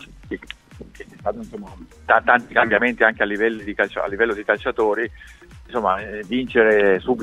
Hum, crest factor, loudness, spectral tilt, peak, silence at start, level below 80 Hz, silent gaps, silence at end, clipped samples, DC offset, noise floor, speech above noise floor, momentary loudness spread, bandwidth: none; 20 dB; -19 LUFS; -6 dB/octave; 0 dBFS; 0 s; -46 dBFS; none; 0 s; under 0.1%; under 0.1%; -41 dBFS; 21 dB; 20 LU; 11 kHz